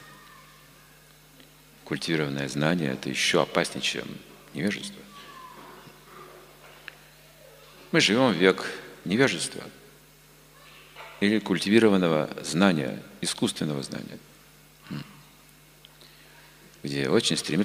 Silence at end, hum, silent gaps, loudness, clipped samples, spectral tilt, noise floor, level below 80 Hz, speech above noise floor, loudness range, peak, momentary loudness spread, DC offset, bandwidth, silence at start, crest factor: 0 s; 50 Hz at -60 dBFS; none; -25 LUFS; under 0.1%; -4.5 dB/octave; -54 dBFS; -64 dBFS; 29 dB; 13 LU; -2 dBFS; 24 LU; under 0.1%; 16 kHz; 0 s; 26 dB